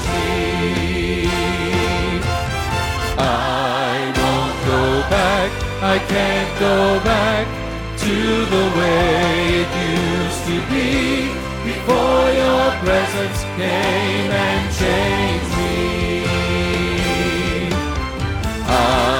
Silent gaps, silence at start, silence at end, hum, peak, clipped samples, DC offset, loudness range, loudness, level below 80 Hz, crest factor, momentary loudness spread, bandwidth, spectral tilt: none; 0 s; 0 s; none; -2 dBFS; under 0.1%; under 0.1%; 2 LU; -18 LUFS; -30 dBFS; 14 dB; 6 LU; 18.5 kHz; -5 dB/octave